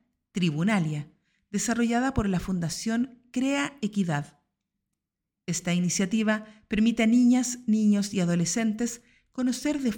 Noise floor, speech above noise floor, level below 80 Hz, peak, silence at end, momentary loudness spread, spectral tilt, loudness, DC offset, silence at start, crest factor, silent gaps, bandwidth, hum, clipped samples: -86 dBFS; 61 dB; -50 dBFS; -12 dBFS; 0 s; 10 LU; -5 dB/octave; -26 LUFS; under 0.1%; 0.35 s; 16 dB; none; 17.5 kHz; none; under 0.1%